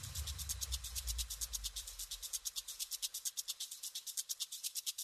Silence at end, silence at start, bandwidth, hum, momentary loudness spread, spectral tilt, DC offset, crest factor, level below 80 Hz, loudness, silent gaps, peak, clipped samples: 0 s; 0 s; 14 kHz; none; 3 LU; 0.5 dB/octave; under 0.1%; 20 dB; -52 dBFS; -41 LUFS; none; -24 dBFS; under 0.1%